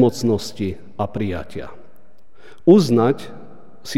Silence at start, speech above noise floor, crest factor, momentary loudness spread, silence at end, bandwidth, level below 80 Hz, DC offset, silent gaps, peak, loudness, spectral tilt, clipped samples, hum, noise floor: 0 s; 37 dB; 18 dB; 22 LU; 0 s; 14.5 kHz; -50 dBFS; 2%; none; -2 dBFS; -19 LUFS; -7 dB/octave; under 0.1%; none; -55 dBFS